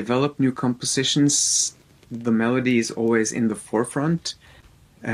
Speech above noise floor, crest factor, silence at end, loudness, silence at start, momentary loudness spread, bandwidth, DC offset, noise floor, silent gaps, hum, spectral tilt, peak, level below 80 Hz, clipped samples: 30 dB; 16 dB; 0 s; -21 LUFS; 0 s; 11 LU; 15 kHz; under 0.1%; -51 dBFS; none; none; -3.5 dB/octave; -6 dBFS; -60 dBFS; under 0.1%